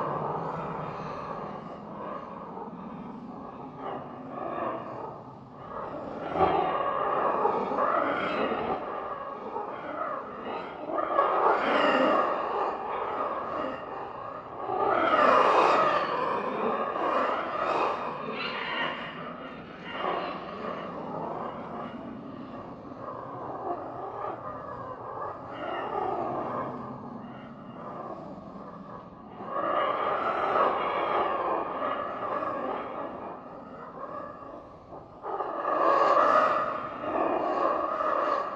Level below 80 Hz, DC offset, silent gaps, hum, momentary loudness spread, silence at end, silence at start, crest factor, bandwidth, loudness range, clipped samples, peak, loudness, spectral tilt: -64 dBFS; under 0.1%; none; none; 17 LU; 0 s; 0 s; 22 dB; 8.6 kHz; 12 LU; under 0.1%; -8 dBFS; -29 LUFS; -6 dB/octave